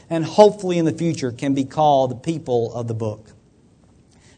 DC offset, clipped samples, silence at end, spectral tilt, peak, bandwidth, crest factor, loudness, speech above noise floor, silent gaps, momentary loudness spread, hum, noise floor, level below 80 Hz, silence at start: under 0.1%; under 0.1%; 1.15 s; -6.5 dB/octave; 0 dBFS; 9.4 kHz; 20 dB; -19 LUFS; 35 dB; none; 12 LU; none; -53 dBFS; -58 dBFS; 0.1 s